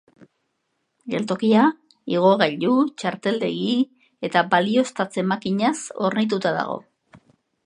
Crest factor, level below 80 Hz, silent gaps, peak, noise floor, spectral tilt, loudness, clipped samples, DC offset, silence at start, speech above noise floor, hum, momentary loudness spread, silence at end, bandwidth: 20 dB; -70 dBFS; none; -2 dBFS; -74 dBFS; -5.5 dB/octave; -21 LUFS; under 0.1%; under 0.1%; 1.05 s; 53 dB; none; 10 LU; 0.5 s; 10.5 kHz